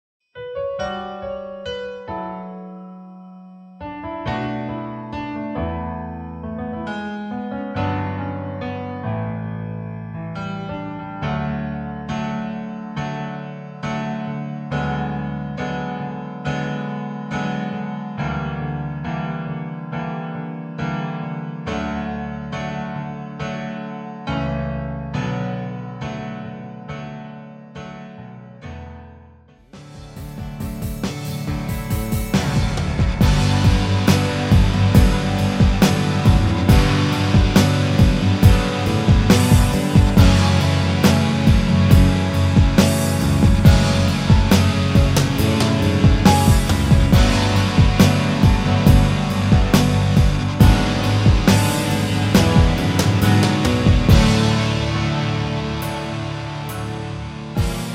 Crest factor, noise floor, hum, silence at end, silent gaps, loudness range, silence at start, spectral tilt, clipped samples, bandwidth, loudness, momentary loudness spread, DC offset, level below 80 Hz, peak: 18 dB; -48 dBFS; none; 0 s; none; 14 LU; 0.35 s; -6 dB/octave; under 0.1%; 16.5 kHz; -19 LUFS; 16 LU; under 0.1%; -26 dBFS; 0 dBFS